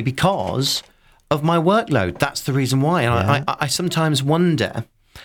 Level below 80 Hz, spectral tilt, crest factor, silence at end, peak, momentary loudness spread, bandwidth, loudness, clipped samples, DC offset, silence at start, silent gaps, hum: -48 dBFS; -5 dB/octave; 16 dB; 0 s; -4 dBFS; 6 LU; 19.5 kHz; -19 LUFS; under 0.1%; under 0.1%; 0 s; none; none